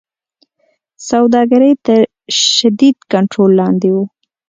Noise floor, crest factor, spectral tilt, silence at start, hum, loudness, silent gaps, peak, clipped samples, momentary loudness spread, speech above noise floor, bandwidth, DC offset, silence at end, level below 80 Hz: -61 dBFS; 12 dB; -4.5 dB/octave; 1 s; none; -11 LUFS; none; 0 dBFS; under 0.1%; 7 LU; 51 dB; 9.4 kHz; under 0.1%; 0.45 s; -58 dBFS